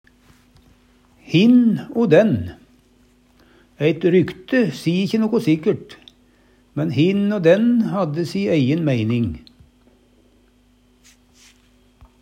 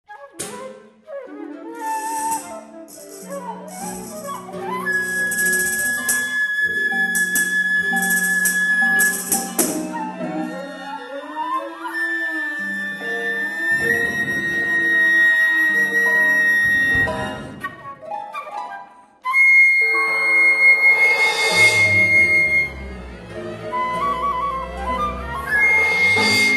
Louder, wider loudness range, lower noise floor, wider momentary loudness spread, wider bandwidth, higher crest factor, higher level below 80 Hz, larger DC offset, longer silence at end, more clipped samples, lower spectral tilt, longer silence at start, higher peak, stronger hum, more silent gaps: about the same, -18 LUFS vs -16 LUFS; second, 5 LU vs 13 LU; first, -56 dBFS vs -41 dBFS; second, 9 LU vs 19 LU; about the same, 13.5 kHz vs 13 kHz; about the same, 20 dB vs 16 dB; second, -54 dBFS vs -46 dBFS; neither; first, 2.85 s vs 0 s; neither; first, -7.5 dB/octave vs -2 dB/octave; first, 1.3 s vs 0.1 s; about the same, 0 dBFS vs -2 dBFS; neither; neither